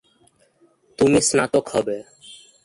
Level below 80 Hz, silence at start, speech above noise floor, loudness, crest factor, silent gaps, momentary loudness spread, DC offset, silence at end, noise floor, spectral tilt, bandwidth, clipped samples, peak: -52 dBFS; 1 s; 40 dB; -19 LUFS; 20 dB; none; 15 LU; under 0.1%; 0.3 s; -59 dBFS; -4 dB/octave; 11.5 kHz; under 0.1%; -4 dBFS